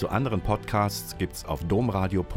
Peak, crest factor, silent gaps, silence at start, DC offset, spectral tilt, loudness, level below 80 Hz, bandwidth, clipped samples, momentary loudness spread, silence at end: -10 dBFS; 16 dB; none; 0 s; under 0.1%; -6 dB/octave; -27 LUFS; -40 dBFS; 17 kHz; under 0.1%; 7 LU; 0 s